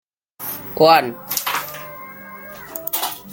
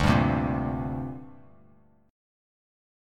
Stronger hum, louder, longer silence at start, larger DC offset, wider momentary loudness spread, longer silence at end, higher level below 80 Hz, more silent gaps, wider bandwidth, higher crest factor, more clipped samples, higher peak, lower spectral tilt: second, none vs 50 Hz at -70 dBFS; first, -19 LUFS vs -28 LUFS; first, 0.4 s vs 0 s; neither; first, 22 LU vs 15 LU; second, 0 s vs 0.95 s; second, -62 dBFS vs -42 dBFS; neither; first, 17 kHz vs 13.5 kHz; about the same, 20 dB vs 22 dB; neither; first, 0 dBFS vs -8 dBFS; second, -3 dB/octave vs -7 dB/octave